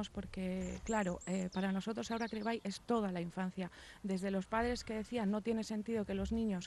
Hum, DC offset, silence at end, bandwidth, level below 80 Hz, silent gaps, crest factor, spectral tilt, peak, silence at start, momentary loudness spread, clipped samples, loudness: none; under 0.1%; 0 s; 12 kHz; -56 dBFS; none; 16 dB; -6 dB/octave; -22 dBFS; 0 s; 5 LU; under 0.1%; -39 LUFS